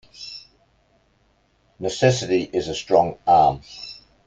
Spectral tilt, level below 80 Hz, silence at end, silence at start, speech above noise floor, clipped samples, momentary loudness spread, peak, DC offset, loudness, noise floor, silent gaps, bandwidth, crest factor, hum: -5 dB/octave; -52 dBFS; 0.35 s; 0.2 s; 43 dB; under 0.1%; 20 LU; -2 dBFS; under 0.1%; -20 LUFS; -63 dBFS; none; 9.4 kHz; 20 dB; none